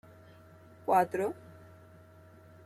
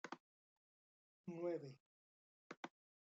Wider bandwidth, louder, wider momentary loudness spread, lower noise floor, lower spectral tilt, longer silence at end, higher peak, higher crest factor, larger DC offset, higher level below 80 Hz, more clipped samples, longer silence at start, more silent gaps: first, 16 kHz vs 7.6 kHz; first, -31 LUFS vs -51 LUFS; first, 26 LU vs 15 LU; second, -56 dBFS vs under -90 dBFS; about the same, -6.5 dB/octave vs -5.5 dB/octave; first, 1.35 s vs 0.35 s; first, -14 dBFS vs -34 dBFS; about the same, 20 dB vs 20 dB; neither; first, -76 dBFS vs under -90 dBFS; neither; first, 0.85 s vs 0.05 s; second, none vs 0.20-1.24 s, 1.80-2.50 s, 2.57-2.63 s